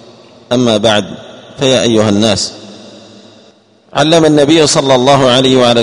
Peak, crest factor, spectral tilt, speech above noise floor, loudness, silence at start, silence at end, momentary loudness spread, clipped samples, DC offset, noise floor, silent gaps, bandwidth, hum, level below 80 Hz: 0 dBFS; 10 dB; -4.5 dB/octave; 36 dB; -9 LUFS; 0.5 s; 0 s; 11 LU; 0.4%; under 0.1%; -45 dBFS; none; 11 kHz; none; -46 dBFS